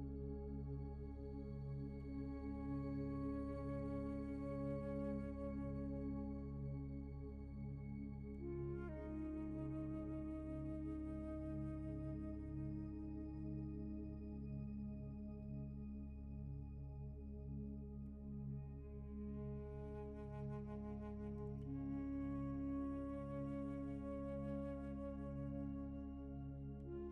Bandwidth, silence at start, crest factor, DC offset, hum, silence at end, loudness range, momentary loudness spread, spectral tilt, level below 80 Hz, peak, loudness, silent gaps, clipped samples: 4.7 kHz; 0 s; 12 dB; under 0.1%; none; 0 s; 5 LU; 6 LU; -10.5 dB/octave; -54 dBFS; -34 dBFS; -48 LUFS; none; under 0.1%